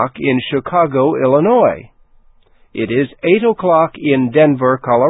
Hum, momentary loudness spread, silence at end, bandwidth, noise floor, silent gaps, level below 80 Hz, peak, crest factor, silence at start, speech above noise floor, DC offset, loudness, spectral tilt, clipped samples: none; 6 LU; 0 s; 4 kHz; -48 dBFS; none; -52 dBFS; 0 dBFS; 14 dB; 0 s; 35 dB; under 0.1%; -14 LUFS; -11.5 dB/octave; under 0.1%